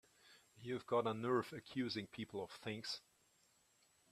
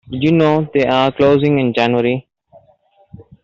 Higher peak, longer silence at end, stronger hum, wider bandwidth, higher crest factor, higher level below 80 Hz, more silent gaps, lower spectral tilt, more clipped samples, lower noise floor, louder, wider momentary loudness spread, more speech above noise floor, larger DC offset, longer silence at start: second, -24 dBFS vs -2 dBFS; first, 1.1 s vs 0.2 s; neither; first, 14.5 kHz vs 7.4 kHz; first, 20 dB vs 14 dB; second, -82 dBFS vs -50 dBFS; neither; second, -5.5 dB/octave vs -8 dB/octave; neither; first, -76 dBFS vs -54 dBFS; second, -43 LUFS vs -14 LUFS; first, 9 LU vs 4 LU; second, 33 dB vs 40 dB; neither; first, 0.25 s vs 0.1 s